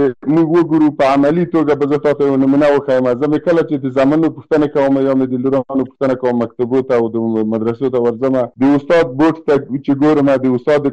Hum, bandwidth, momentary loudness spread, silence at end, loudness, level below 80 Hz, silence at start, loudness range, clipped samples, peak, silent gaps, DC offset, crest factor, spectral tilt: none; 8.2 kHz; 5 LU; 0 s; -14 LUFS; -50 dBFS; 0 s; 3 LU; under 0.1%; -6 dBFS; none; under 0.1%; 8 dB; -8.5 dB/octave